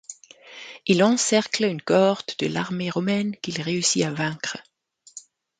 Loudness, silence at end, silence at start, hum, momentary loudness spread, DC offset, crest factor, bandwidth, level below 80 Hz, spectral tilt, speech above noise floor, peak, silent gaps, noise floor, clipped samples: -23 LUFS; 0.4 s; 0.1 s; none; 22 LU; under 0.1%; 20 dB; 9.6 kHz; -66 dBFS; -4 dB/octave; 25 dB; -4 dBFS; none; -48 dBFS; under 0.1%